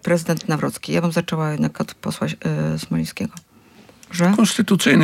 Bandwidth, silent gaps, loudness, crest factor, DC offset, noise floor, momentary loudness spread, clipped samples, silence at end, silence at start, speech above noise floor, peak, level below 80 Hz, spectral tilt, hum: 16 kHz; none; -21 LUFS; 18 dB; under 0.1%; -49 dBFS; 11 LU; under 0.1%; 0 s; 0.05 s; 29 dB; -2 dBFS; -56 dBFS; -5.5 dB/octave; none